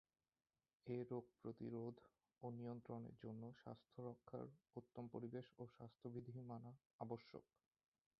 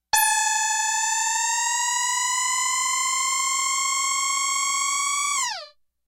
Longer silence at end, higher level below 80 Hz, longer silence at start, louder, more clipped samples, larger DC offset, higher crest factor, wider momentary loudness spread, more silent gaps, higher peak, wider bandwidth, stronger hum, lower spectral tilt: first, 0.75 s vs 0.4 s; second, -86 dBFS vs -66 dBFS; first, 0.85 s vs 0.15 s; second, -55 LUFS vs -21 LUFS; neither; neither; about the same, 20 dB vs 18 dB; first, 9 LU vs 2 LU; first, 6.86-6.99 s vs none; second, -34 dBFS vs -6 dBFS; second, 5.6 kHz vs 16 kHz; neither; first, -8.5 dB/octave vs 4.5 dB/octave